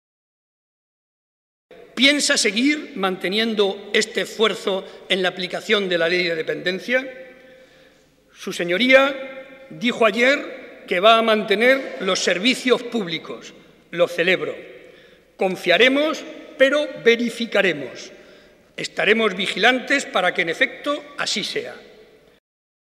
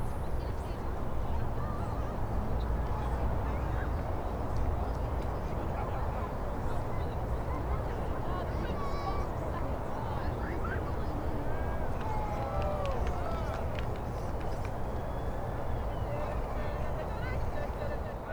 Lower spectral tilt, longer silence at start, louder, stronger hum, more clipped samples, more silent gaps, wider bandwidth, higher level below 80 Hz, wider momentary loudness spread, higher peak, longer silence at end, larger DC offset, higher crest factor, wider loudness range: second, -3 dB/octave vs -7.5 dB/octave; first, 1.7 s vs 0 s; first, -19 LUFS vs -36 LUFS; neither; neither; neither; second, 15 kHz vs over 20 kHz; second, -66 dBFS vs -36 dBFS; first, 17 LU vs 3 LU; first, -2 dBFS vs -20 dBFS; first, 1.15 s vs 0 s; second, under 0.1% vs 0.1%; first, 20 dB vs 14 dB; about the same, 4 LU vs 2 LU